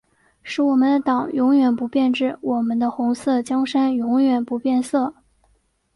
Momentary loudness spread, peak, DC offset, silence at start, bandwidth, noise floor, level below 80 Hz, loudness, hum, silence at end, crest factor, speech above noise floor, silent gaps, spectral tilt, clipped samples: 5 LU; -8 dBFS; under 0.1%; 0.45 s; 11.5 kHz; -63 dBFS; -64 dBFS; -20 LUFS; none; 0.85 s; 12 dB; 44 dB; none; -5 dB/octave; under 0.1%